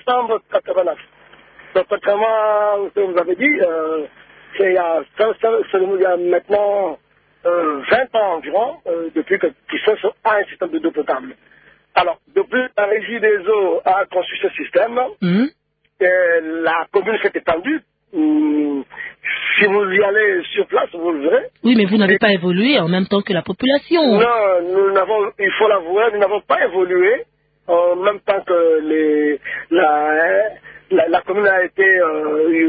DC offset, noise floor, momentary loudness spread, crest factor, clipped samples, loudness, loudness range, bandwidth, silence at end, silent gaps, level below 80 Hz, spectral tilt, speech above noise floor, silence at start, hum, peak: under 0.1%; -45 dBFS; 8 LU; 16 dB; under 0.1%; -17 LUFS; 4 LU; 4.9 kHz; 0 s; none; -60 dBFS; -10.5 dB/octave; 29 dB; 0.05 s; none; -2 dBFS